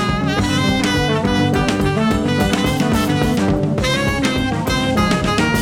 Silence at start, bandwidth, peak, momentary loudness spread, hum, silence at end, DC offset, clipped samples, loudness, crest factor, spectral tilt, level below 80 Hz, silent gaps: 0 s; 18 kHz; -2 dBFS; 2 LU; none; 0 s; under 0.1%; under 0.1%; -17 LUFS; 14 dB; -5.5 dB/octave; -30 dBFS; none